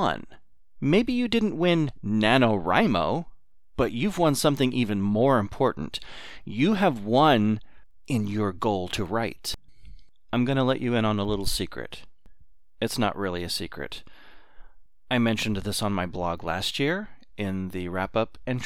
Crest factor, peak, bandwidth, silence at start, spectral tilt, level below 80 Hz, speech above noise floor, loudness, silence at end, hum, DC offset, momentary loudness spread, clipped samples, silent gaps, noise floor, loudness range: 20 dB; -6 dBFS; 16.5 kHz; 0 s; -5.5 dB/octave; -46 dBFS; 30 dB; -25 LUFS; 0 s; none; 0.9%; 13 LU; under 0.1%; none; -55 dBFS; 6 LU